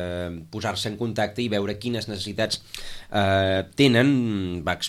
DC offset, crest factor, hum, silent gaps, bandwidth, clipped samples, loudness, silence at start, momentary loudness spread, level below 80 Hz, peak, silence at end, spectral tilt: under 0.1%; 18 dB; none; none; 15 kHz; under 0.1%; -24 LUFS; 0 s; 11 LU; -50 dBFS; -6 dBFS; 0 s; -5.5 dB/octave